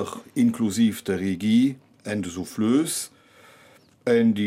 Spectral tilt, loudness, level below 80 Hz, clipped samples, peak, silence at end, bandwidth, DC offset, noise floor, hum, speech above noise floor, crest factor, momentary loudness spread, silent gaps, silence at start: -5 dB/octave; -24 LUFS; -66 dBFS; under 0.1%; -10 dBFS; 0 s; 16 kHz; under 0.1%; -54 dBFS; none; 32 dB; 14 dB; 11 LU; none; 0 s